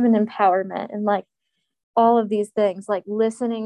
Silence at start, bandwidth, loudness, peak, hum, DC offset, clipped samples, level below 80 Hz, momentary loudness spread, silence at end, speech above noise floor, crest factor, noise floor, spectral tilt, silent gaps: 0 s; 11 kHz; -21 LUFS; -4 dBFS; none; under 0.1%; under 0.1%; -74 dBFS; 8 LU; 0 s; 57 dB; 16 dB; -77 dBFS; -7 dB/octave; 1.83-1.94 s